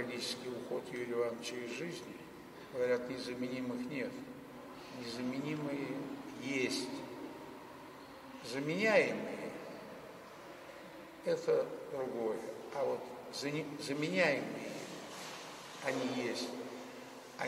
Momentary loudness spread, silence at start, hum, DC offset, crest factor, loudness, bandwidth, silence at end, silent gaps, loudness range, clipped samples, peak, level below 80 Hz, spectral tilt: 17 LU; 0 s; none; under 0.1%; 22 dB; -38 LUFS; 16 kHz; 0 s; none; 4 LU; under 0.1%; -16 dBFS; -76 dBFS; -4.5 dB/octave